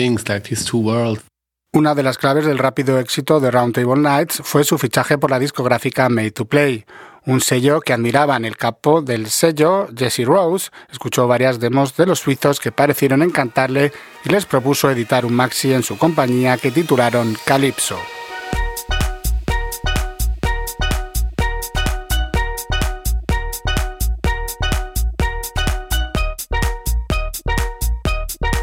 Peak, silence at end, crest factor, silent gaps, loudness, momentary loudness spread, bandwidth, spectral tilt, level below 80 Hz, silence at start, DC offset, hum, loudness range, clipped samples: 0 dBFS; 0 s; 18 dB; none; -18 LUFS; 8 LU; 17.5 kHz; -5 dB/octave; -26 dBFS; 0 s; under 0.1%; none; 6 LU; under 0.1%